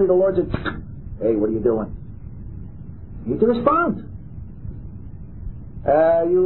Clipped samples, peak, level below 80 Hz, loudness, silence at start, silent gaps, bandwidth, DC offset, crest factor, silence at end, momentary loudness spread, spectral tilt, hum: under 0.1%; -2 dBFS; -38 dBFS; -20 LUFS; 0 s; none; 4.2 kHz; 0.9%; 18 dB; 0 s; 21 LU; -12 dB/octave; none